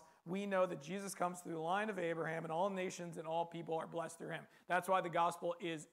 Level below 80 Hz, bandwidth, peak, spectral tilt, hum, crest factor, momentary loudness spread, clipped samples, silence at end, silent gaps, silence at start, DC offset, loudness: -90 dBFS; 16 kHz; -20 dBFS; -5 dB/octave; none; 20 dB; 9 LU; under 0.1%; 0.05 s; none; 0 s; under 0.1%; -40 LUFS